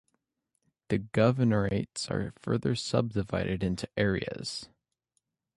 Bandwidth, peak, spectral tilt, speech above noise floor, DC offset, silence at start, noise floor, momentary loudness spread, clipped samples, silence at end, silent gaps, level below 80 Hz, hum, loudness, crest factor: 11.5 kHz; -10 dBFS; -6 dB/octave; 52 dB; under 0.1%; 0.9 s; -81 dBFS; 8 LU; under 0.1%; 0.9 s; none; -52 dBFS; none; -30 LUFS; 20 dB